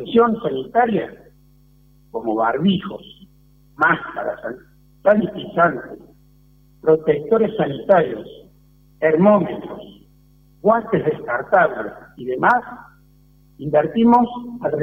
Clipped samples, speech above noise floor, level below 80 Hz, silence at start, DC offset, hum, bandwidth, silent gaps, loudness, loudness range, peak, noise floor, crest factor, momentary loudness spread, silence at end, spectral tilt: under 0.1%; 34 dB; -54 dBFS; 0 s; under 0.1%; none; 5.6 kHz; none; -18 LUFS; 4 LU; -2 dBFS; -52 dBFS; 16 dB; 17 LU; 0 s; -8.5 dB/octave